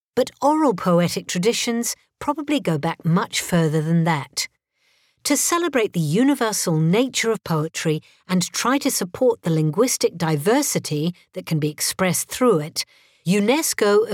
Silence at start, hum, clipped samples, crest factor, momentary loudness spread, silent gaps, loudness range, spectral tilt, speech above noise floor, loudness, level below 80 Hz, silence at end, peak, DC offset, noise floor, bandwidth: 0.15 s; none; under 0.1%; 14 dB; 8 LU; none; 1 LU; -4.5 dB/octave; 44 dB; -21 LUFS; -60 dBFS; 0 s; -6 dBFS; under 0.1%; -64 dBFS; 17.5 kHz